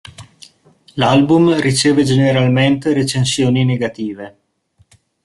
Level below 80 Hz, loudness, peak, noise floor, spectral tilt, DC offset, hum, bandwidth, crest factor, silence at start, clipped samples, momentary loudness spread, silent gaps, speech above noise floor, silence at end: -50 dBFS; -14 LUFS; -2 dBFS; -57 dBFS; -5.5 dB/octave; under 0.1%; none; 12 kHz; 14 dB; 0.05 s; under 0.1%; 14 LU; none; 43 dB; 0.95 s